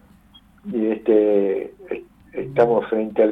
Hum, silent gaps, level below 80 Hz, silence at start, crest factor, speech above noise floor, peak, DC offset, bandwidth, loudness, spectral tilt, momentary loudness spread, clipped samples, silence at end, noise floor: none; none; -58 dBFS; 0.65 s; 16 dB; 33 dB; -4 dBFS; under 0.1%; 4.9 kHz; -20 LUFS; -9 dB/octave; 16 LU; under 0.1%; 0 s; -51 dBFS